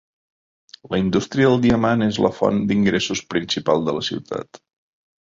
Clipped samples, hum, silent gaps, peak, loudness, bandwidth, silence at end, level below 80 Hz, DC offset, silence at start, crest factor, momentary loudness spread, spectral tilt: under 0.1%; none; none; -2 dBFS; -20 LUFS; 7.8 kHz; 0.75 s; -48 dBFS; under 0.1%; 0.85 s; 18 dB; 9 LU; -5.5 dB/octave